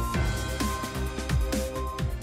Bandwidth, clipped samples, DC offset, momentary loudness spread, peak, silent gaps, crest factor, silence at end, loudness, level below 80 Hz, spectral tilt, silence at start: 16 kHz; under 0.1%; under 0.1%; 4 LU; -16 dBFS; none; 12 dB; 0 s; -30 LUFS; -32 dBFS; -5 dB/octave; 0 s